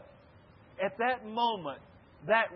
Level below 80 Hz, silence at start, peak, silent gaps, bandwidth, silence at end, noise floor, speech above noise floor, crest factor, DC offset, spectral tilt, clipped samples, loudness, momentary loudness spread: -70 dBFS; 0 s; -12 dBFS; none; 5.6 kHz; 0 s; -58 dBFS; 26 dB; 20 dB; under 0.1%; -1.5 dB/octave; under 0.1%; -32 LUFS; 18 LU